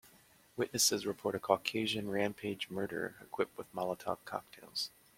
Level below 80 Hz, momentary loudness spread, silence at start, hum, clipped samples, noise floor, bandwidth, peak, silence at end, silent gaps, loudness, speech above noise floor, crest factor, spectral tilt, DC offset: -72 dBFS; 12 LU; 0.05 s; none; under 0.1%; -64 dBFS; 16.5 kHz; -12 dBFS; 0.3 s; none; -36 LUFS; 28 dB; 26 dB; -2.5 dB/octave; under 0.1%